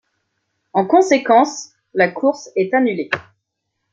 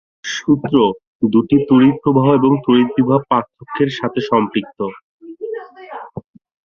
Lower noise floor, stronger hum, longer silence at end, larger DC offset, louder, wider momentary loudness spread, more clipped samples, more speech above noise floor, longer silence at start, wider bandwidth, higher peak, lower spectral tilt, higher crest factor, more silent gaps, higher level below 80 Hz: first, -75 dBFS vs -34 dBFS; neither; first, 0.7 s vs 0.45 s; neither; about the same, -17 LUFS vs -15 LUFS; second, 11 LU vs 18 LU; neither; first, 59 dB vs 19 dB; first, 0.75 s vs 0.25 s; first, 7.8 kHz vs 7 kHz; about the same, -2 dBFS vs 0 dBFS; second, -4.5 dB/octave vs -7 dB/octave; about the same, 16 dB vs 16 dB; second, none vs 1.07-1.20 s, 5.03-5.19 s; second, -66 dBFS vs -54 dBFS